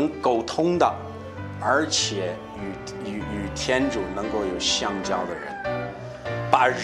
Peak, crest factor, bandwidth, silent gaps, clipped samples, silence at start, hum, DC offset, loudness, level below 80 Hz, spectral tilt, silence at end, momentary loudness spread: -2 dBFS; 24 dB; 12.5 kHz; none; under 0.1%; 0 s; none; under 0.1%; -25 LUFS; -48 dBFS; -3.5 dB/octave; 0 s; 13 LU